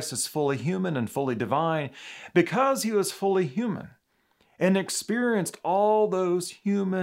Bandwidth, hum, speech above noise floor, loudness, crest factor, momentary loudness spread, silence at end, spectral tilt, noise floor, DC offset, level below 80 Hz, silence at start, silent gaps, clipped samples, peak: 16 kHz; none; 42 dB; -26 LUFS; 18 dB; 6 LU; 0 s; -5 dB/octave; -68 dBFS; under 0.1%; -76 dBFS; 0 s; none; under 0.1%; -8 dBFS